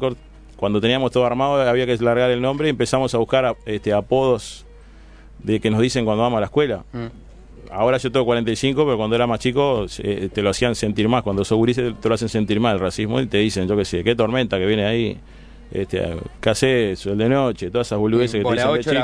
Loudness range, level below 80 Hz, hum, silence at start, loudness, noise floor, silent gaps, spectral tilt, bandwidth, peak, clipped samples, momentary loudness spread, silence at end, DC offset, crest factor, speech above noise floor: 3 LU; -42 dBFS; none; 0 s; -20 LUFS; -43 dBFS; none; -5.5 dB/octave; 11 kHz; -2 dBFS; under 0.1%; 7 LU; 0 s; under 0.1%; 16 dB; 24 dB